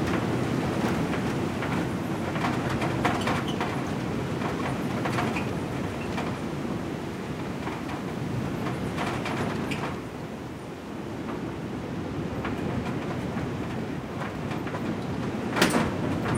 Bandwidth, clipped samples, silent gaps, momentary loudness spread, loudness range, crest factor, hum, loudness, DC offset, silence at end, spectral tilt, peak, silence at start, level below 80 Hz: 16 kHz; under 0.1%; none; 7 LU; 5 LU; 24 dB; none; -30 LUFS; under 0.1%; 0 s; -6 dB/octave; -6 dBFS; 0 s; -50 dBFS